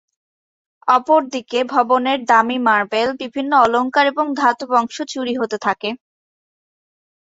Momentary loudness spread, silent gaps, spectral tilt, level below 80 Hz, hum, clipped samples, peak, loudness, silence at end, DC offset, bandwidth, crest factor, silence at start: 10 LU; none; -3.5 dB/octave; -62 dBFS; none; under 0.1%; -2 dBFS; -17 LUFS; 1.25 s; under 0.1%; 8 kHz; 18 dB; 0.85 s